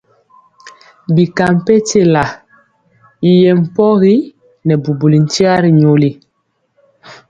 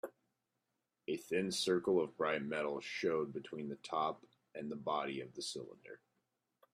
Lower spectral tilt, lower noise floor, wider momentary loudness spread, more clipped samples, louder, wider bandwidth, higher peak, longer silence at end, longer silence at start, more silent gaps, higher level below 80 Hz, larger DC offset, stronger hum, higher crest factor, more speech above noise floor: first, -6.5 dB/octave vs -4 dB/octave; second, -64 dBFS vs -87 dBFS; second, 8 LU vs 17 LU; neither; first, -11 LUFS vs -39 LUFS; second, 9 kHz vs 14.5 kHz; first, 0 dBFS vs -22 dBFS; second, 0.15 s vs 0.8 s; first, 0.65 s vs 0.05 s; neither; first, -50 dBFS vs -80 dBFS; neither; neither; second, 12 dB vs 18 dB; first, 54 dB vs 48 dB